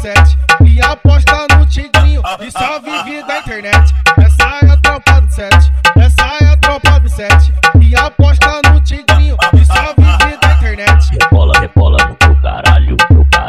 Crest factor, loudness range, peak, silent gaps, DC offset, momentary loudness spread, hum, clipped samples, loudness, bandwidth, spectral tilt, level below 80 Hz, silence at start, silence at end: 8 dB; 2 LU; 0 dBFS; none; under 0.1%; 5 LU; none; 0.6%; -9 LUFS; 12.5 kHz; -5 dB/octave; -12 dBFS; 0 s; 0 s